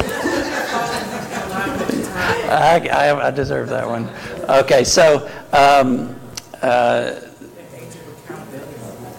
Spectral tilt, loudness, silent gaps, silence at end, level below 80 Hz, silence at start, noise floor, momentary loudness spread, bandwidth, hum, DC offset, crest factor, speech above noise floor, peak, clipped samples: -4 dB/octave; -17 LUFS; none; 0 s; -46 dBFS; 0 s; -38 dBFS; 21 LU; 17 kHz; none; under 0.1%; 16 dB; 23 dB; -2 dBFS; under 0.1%